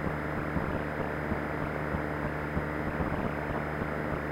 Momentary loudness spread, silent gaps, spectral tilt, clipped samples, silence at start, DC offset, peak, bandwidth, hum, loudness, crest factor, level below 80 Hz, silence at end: 1 LU; none; -8 dB/octave; under 0.1%; 0 s; under 0.1%; -16 dBFS; 16 kHz; none; -33 LUFS; 16 dB; -42 dBFS; 0 s